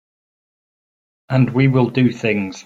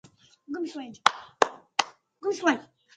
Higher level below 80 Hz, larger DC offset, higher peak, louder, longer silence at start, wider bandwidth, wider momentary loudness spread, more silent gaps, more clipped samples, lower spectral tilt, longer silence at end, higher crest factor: first, -54 dBFS vs -74 dBFS; neither; about the same, -2 dBFS vs 0 dBFS; first, -17 LUFS vs -28 LUFS; first, 1.3 s vs 0.5 s; second, 7.6 kHz vs 11.5 kHz; second, 5 LU vs 10 LU; neither; neither; first, -8 dB/octave vs -2 dB/octave; second, 0.05 s vs 0.35 s; second, 16 dB vs 30 dB